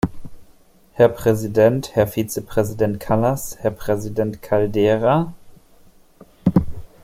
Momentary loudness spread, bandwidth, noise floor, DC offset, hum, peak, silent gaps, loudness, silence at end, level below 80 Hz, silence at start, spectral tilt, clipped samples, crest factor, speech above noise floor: 8 LU; 16.5 kHz; -50 dBFS; under 0.1%; none; -2 dBFS; none; -20 LUFS; 0.2 s; -42 dBFS; 0.05 s; -7 dB/octave; under 0.1%; 18 dB; 32 dB